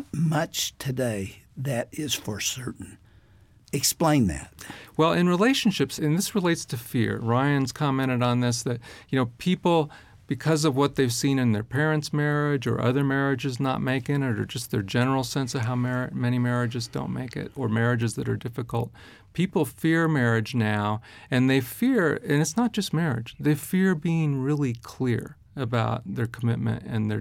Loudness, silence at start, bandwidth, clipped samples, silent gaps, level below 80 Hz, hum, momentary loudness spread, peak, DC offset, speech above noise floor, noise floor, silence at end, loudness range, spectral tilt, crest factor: -25 LUFS; 0 s; 17 kHz; under 0.1%; none; -54 dBFS; none; 9 LU; -8 dBFS; under 0.1%; 30 dB; -55 dBFS; 0 s; 4 LU; -5.5 dB/octave; 16 dB